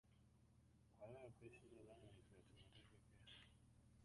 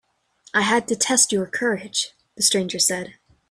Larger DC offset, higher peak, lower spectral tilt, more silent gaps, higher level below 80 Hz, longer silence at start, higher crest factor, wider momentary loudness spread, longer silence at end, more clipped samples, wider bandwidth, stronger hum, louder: neither; second, -48 dBFS vs -4 dBFS; first, -5.5 dB/octave vs -1.5 dB/octave; neither; second, -78 dBFS vs -64 dBFS; second, 0.05 s vs 0.55 s; about the same, 18 dB vs 20 dB; about the same, 8 LU vs 9 LU; second, 0 s vs 0.4 s; neither; second, 11 kHz vs 15.5 kHz; neither; second, -65 LUFS vs -20 LUFS